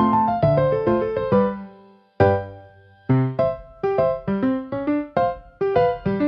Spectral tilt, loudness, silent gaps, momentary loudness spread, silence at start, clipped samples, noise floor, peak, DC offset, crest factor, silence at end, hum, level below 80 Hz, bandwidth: -10.5 dB/octave; -21 LUFS; none; 8 LU; 0 s; under 0.1%; -49 dBFS; -2 dBFS; under 0.1%; 20 dB; 0 s; none; -48 dBFS; 5.8 kHz